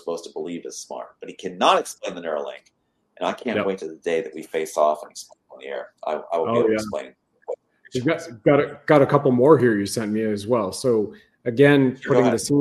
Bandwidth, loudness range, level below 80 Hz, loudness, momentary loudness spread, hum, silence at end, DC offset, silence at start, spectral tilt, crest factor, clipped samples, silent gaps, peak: 13 kHz; 7 LU; -62 dBFS; -21 LUFS; 19 LU; none; 0 s; under 0.1%; 0.05 s; -5.5 dB/octave; 22 dB; under 0.1%; none; 0 dBFS